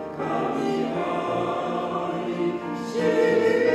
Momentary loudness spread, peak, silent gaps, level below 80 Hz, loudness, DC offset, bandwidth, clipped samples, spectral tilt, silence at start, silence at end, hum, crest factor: 8 LU; -10 dBFS; none; -60 dBFS; -25 LUFS; under 0.1%; 12.5 kHz; under 0.1%; -6 dB/octave; 0 s; 0 s; none; 14 dB